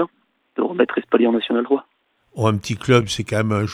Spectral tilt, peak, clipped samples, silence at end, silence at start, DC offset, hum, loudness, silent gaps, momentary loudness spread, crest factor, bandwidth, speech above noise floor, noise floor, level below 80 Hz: -6 dB/octave; -2 dBFS; under 0.1%; 0 s; 0 s; under 0.1%; none; -20 LUFS; none; 8 LU; 18 dB; 14 kHz; 41 dB; -60 dBFS; -52 dBFS